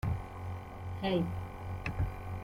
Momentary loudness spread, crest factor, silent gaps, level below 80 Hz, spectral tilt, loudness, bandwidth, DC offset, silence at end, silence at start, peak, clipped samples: 10 LU; 16 dB; none; -46 dBFS; -7.5 dB/octave; -38 LUFS; 15.5 kHz; under 0.1%; 0 s; 0.05 s; -20 dBFS; under 0.1%